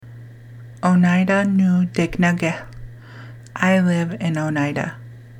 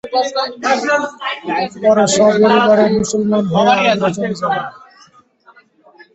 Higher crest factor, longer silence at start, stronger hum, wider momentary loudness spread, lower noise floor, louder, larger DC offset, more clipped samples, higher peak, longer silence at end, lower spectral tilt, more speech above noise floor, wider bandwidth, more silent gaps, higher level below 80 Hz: about the same, 18 dB vs 14 dB; about the same, 0.05 s vs 0.05 s; neither; first, 23 LU vs 9 LU; second, -39 dBFS vs -49 dBFS; second, -19 LUFS vs -14 LUFS; neither; neither; about the same, -2 dBFS vs 0 dBFS; second, 0 s vs 1.45 s; first, -7 dB/octave vs -4.5 dB/octave; second, 21 dB vs 35 dB; first, 10.5 kHz vs 8.2 kHz; neither; first, -48 dBFS vs -54 dBFS